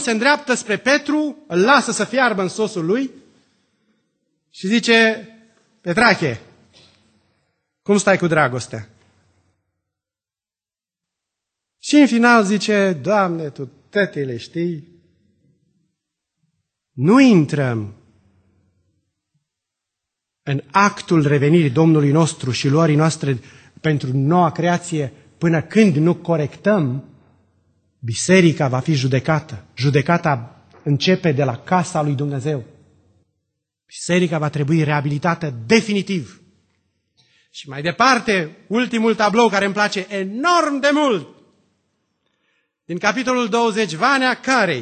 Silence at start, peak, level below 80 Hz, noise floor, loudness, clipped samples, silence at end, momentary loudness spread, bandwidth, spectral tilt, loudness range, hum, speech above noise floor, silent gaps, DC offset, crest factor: 0 s; 0 dBFS; -58 dBFS; under -90 dBFS; -17 LUFS; under 0.1%; 0 s; 13 LU; 9.2 kHz; -5.5 dB/octave; 5 LU; none; over 73 dB; none; under 0.1%; 18 dB